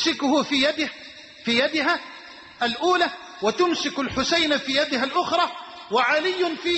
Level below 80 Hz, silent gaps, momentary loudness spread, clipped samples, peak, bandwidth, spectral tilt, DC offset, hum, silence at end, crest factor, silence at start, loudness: -56 dBFS; none; 11 LU; under 0.1%; -8 dBFS; 8.4 kHz; -2.5 dB/octave; under 0.1%; none; 0 s; 14 dB; 0 s; -22 LUFS